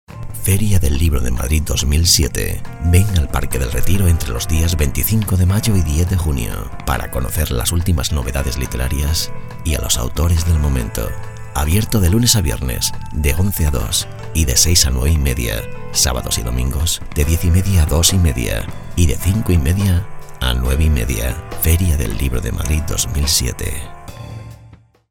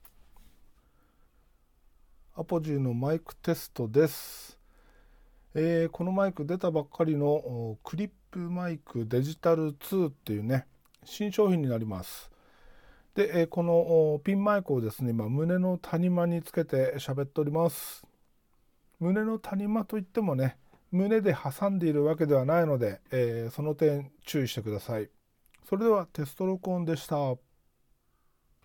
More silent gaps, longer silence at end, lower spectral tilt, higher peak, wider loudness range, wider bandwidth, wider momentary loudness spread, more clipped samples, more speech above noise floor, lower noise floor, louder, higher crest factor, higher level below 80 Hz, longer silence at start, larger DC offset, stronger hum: neither; second, 0.35 s vs 1.25 s; second, -4 dB/octave vs -7.5 dB/octave; first, 0 dBFS vs -12 dBFS; about the same, 3 LU vs 4 LU; about the same, 18.5 kHz vs 18 kHz; about the same, 10 LU vs 11 LU; neither; second, 28 dB vs 41 dB; second, -44 dBFS vs -70 dBFS; first, -17 LUFS vs -29 LUFS; about the same, 16 dB vs 18 dB; first, -22 dBFS vs -64 dBFS; second, 0.1 s vs 0.4 s; neither; neither